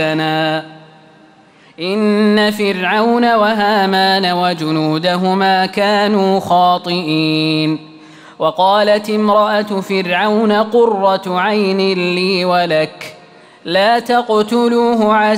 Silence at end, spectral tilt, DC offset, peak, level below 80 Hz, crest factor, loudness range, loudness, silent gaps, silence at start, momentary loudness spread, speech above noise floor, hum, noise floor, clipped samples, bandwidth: 0 s; -5.5 dB/octave; under 0.1%; -2 dBFS; -60 dBFS; 12 dB; 2 LU; -14 LUFS; none; 0 s; 6 LU; 32 dB; none; -45 dBFS; under 0.1%; 16 kHz